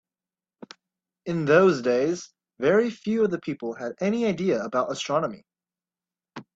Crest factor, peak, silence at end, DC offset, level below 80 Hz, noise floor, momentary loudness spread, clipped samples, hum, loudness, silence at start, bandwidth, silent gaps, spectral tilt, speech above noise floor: 18 dB; -6 dBFS; 0.15 s; under 0.1%; -68 dBFS; under -90 dBFS; 14 LU; under 0.1%; none; -24 LUFS; 1.25 s; 8 kHz; none; -6 dB/octave; over 66 dB